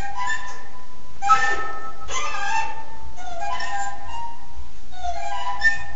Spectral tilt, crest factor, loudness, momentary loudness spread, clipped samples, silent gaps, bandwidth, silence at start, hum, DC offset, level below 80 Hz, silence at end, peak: -2 dB/octave; 22 dB; -25 LUFS; 22 LU; under 0.1%; none; 8.2 kHz; 0 s; none; 10%; -44 dBFS; 0 s; -4 dBFS